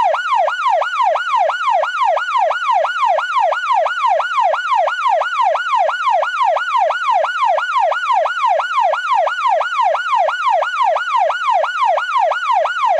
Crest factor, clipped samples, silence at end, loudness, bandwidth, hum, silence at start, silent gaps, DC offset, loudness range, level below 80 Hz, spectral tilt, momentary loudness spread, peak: 10 dB; under 0.1%; 0 s; -16 LUFS; 11 kHz; none; 0 s; none; under 0.1%; 0 LU; -76 dBFS; 2 dB/octave; 1 LU; -6 dBFS